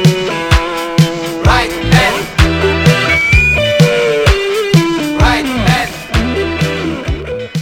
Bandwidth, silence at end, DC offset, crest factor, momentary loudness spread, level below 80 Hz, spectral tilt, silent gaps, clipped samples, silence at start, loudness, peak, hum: 17 kHz; 0 s; under 0.1%; 12 dB; 7 LU; -20 dBFS; -5.5 dB/octave; none; 0.4%; 0 s; -12 LUFS; 0 dBFS; none